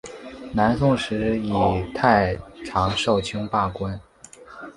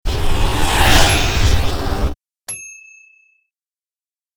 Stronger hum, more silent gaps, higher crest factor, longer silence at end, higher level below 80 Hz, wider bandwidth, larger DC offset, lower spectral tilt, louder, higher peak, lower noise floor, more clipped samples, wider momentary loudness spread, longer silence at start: neither; neither; first, 22 dB vs 16 dB; second, 0.05 s vs 1.65 s; second, -42 dBFS vs -20 dBFS; second, 11.5 kHz vs over 20 kHz; neither; first, -6 dB/octave vs -3.5 dB/octave; second, -22 LUFS vs -16 LUFS; about the same, -2 dBFS vs 0 dBFS; second, -46 dBFS vs under -90 dBFS; neither; about the same, 18 LU vs 17 LU; about the same, 0.05 s vs 0.05 s